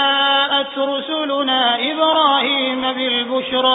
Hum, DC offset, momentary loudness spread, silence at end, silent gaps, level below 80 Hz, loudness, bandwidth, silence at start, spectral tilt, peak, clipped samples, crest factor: none; under 0.1%; 6 LU; 0 s; none; -64 dBFS; -16 LUFS; 4 kHz; 0 s; -7.5 dB/octave; -2 dBFS; under 0.1%; 14 dB